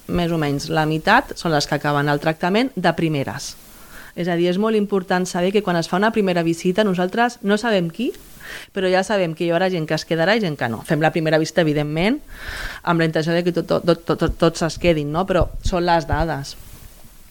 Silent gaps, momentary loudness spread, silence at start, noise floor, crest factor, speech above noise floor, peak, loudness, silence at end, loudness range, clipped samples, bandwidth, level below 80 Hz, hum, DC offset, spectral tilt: none; 9 LU; 0.1 s; -41 dBFS; 18 dB; 22 dB; -2 dBFS; -20 LUFS; 0.25 s; 2 LU; under 0.1%; 19 kHz; -36 dBFS; none; under 0.1%; -5.5 dB/octave